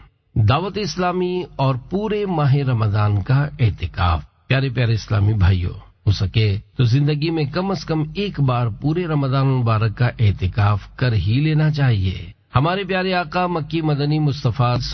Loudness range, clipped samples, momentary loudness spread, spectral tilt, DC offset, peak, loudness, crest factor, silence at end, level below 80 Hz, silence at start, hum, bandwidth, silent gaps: 1 LU; under 0.1%; 5 LU; -7.5 dB/octave; under 0.1%; -4 dBFS; -20 LUFS; 14 dB; 0 s; -34 dBFS; 0.35 s; none; 6.4 kHz; none